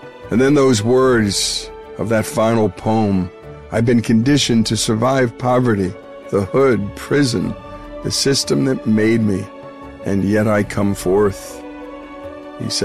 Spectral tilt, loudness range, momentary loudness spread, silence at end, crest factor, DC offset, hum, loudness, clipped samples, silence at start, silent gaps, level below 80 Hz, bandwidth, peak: -5 dB/octave; 2 LU; 19 LU; 0 s; 10 dB; 0.5%; none; -16 LUFS; under 0.1%; 0 s; none; -42 dBFS; 13.5 kHz; -6 dBFS